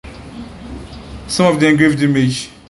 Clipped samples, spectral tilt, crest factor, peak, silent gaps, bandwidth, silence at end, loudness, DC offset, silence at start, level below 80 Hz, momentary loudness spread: under 0.1%; -5.5 dB/octave; 16 dB; 0 dBFS; none; 11.5 kHz; 0.2 s; -14 LUFS; under 0.1%; 0.05 s; -38 dBFS; 21 LU